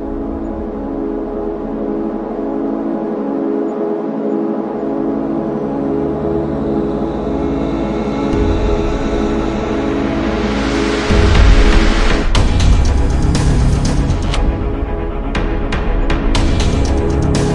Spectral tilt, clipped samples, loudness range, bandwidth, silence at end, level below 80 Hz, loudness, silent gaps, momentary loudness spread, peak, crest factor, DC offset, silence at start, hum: -6.5 dB/octave; under 0.1%; 5 LU; 11 kHz; 0 s; -18 dBFS; -17 LUFS; none; 7 LU; 0 dBFS; 14 dB; under 0.1%; 0 s; none